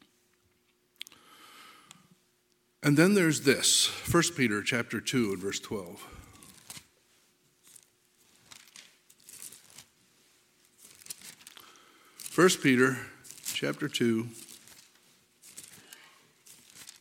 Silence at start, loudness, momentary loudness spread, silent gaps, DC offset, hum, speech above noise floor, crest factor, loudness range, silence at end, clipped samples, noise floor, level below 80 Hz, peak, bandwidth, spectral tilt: 2.8 s; -27 LUFS; 27 LU; none; under 0.1%; none; 44 dB; 24 dB; 23 LU; 0.15 s; under 0.1%; -71 dBFS; -64 dBFS; -8 dBFS; 17.5 kHz; -3.5 dB/octave